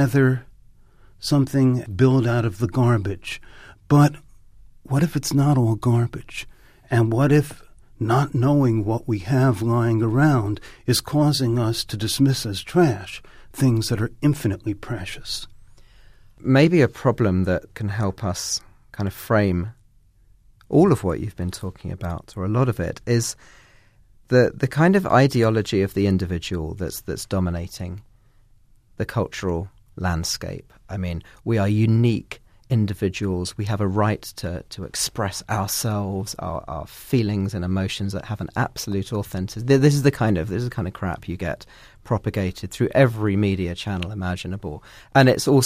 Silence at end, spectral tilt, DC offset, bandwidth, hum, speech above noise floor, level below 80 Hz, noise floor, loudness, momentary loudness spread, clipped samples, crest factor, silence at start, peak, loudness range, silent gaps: 0 s; -6 dB/octave; under 0.1%; 15.5 kHz; none; 34 dB; -44 dBFS; -55 dBFS; -22 LUFS; 14 LU; under 0.1%; 20 dB; 0 s; -2 dBFS; 5 LU; none